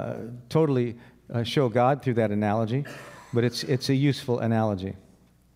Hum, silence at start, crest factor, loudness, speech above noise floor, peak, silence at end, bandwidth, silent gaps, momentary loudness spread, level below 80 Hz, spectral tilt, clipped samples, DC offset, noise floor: none; 0 s; 16 dB; -26 LUFS; 33 dB; -8 dBFS; 0.55 s; 16 kHz; none; 14 LU; -62 dBFS; -7 dB/octave; under 0.1%; under 0.1%; -58 dBFS